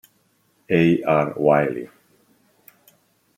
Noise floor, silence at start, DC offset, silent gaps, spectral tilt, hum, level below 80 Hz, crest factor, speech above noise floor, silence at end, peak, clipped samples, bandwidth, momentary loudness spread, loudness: -64 dBFS; 0.7 s; under 0.1%; none; -8.5 dB/octave; none; -62 dBFS; 20 dB; 45 dB; 1.5 s; -4 dBFS; under 0.1%; 16.5 kHz; 13 LU; -19 LUFS